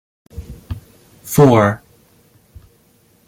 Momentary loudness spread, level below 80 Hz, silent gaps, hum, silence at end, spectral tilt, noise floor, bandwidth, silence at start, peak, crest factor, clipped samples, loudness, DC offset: 27 LU; -42 dBFS; none; none; 1.5 s; -7 dB/octave; -54 dBFS; 17 kHz; 0.35 s; -2 dBFS; 18 dB; under 0.1%; -13 LUFS; under 0.1%